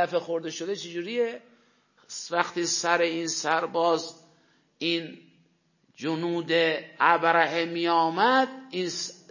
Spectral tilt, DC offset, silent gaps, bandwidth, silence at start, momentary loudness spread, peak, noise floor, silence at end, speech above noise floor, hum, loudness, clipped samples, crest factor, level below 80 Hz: -3 dB/octave; under 0.1%; none; 7.4 kHz; 0 s; 11 LU; -6 dBFS; -67 dBFS; 0.15 s; 41 dB; none; -26 LUFS; under 0.1%; 22 dB; -82 dBFS